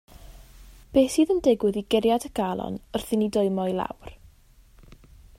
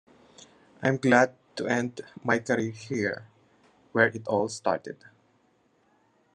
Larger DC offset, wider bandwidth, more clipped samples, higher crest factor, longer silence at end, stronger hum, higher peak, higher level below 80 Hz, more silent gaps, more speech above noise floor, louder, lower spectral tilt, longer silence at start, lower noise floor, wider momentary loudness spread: neither; first, 16 kHz vs 10.5 kHz; neither; second, 18 dB vs 24 dB; second, 1.25 s vs 1.4 s; neither; second, -8 dBFS vs -4 dBFS; first, -50 dBFS vs -72 dBFS; neither; second, 31 dB vs 40 dB; first, -24 LUFS vs -27 LUFS; about the same, -5.5 dB/octave vs -5.5 dB/octave; second, 0.3 s vs 0.8 s; second, -55 dBFS vs -67 dBFS; second, 11 LU vs 14 LU